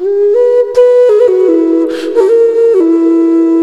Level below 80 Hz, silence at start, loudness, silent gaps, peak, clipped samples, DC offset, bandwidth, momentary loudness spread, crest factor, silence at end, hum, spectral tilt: -56 dBFS; 0 s; -8 LUFS; none; 0 dBFS; 0.2%; under 0.1%; 8.6 kHz; 4 LU; 8 dB; 0 s; none; -5.5 dB/octave